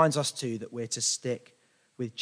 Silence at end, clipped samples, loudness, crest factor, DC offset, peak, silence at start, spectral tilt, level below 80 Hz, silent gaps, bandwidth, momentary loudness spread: 0 s; under 0.1%; -31 LUFS; 22 dB; under 0.1%; -8 dBFS; 0 s; -3.5 dB/octave; -80 dBFS; none; 10.5 kHz; 11 LU